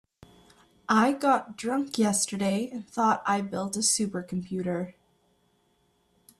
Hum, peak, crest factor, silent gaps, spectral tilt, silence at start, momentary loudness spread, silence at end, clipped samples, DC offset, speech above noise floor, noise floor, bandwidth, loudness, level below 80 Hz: none; -10 dBFS; 20 dB; none; -3.5 dB/octave; 0.9 s; 10 LU; 1.5 s; under 0.1%; under 0.1%; 42 dB; -69 dBFS; 14 kHz; -27 LUFS; -68 dBFS